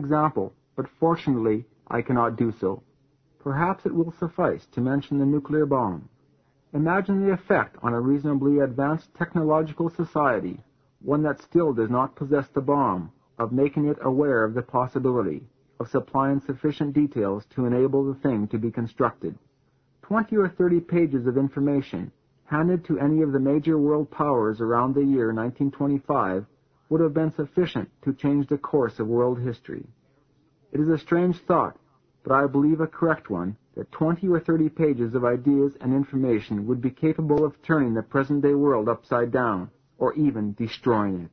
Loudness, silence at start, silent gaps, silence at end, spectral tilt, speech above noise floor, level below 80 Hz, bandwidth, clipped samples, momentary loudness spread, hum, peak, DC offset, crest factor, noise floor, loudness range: -24 LUFS; 0 s; none; 0.05 s; -10 dB/octave; 42 dB; -56 dBFS; 6 kHz; under 0.1%; 9 LU; none; -6 dBFS; under 0.1%; 18 dB; -65 dBFS; 3 LU